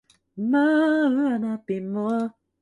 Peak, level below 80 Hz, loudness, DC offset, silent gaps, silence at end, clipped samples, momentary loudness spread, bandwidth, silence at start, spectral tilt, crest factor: -12 dBFS; -72 dBFS; -23 LUFS; under 0.1%; none; 0.3 s; under 0.1%; 10 LU; 10.5 kHz; 0.35 s; -7.5 dB/octave; 12 dB